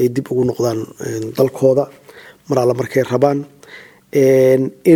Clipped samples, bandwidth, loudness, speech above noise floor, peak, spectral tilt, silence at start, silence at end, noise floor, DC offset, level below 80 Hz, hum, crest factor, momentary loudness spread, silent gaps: under 0.1%; 17 kHz; -16 LUFS; 26 dB; 0 dBFS; -7 dB/octave; 0 s; 0 s; -41 dBFS; under 0.1%; -56 dBFS; none; 16 dB; 12 LU; none